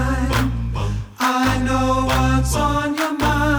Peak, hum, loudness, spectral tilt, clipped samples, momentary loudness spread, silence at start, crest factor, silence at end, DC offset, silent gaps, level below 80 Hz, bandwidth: -6 dBFS; none; -19 LUFS; -5.5 dB/octave; under 0.1%; 6 LU; 0 s; 14 dB; 0 s; under 0.1%; none; -26 dBFS; over 20 kHz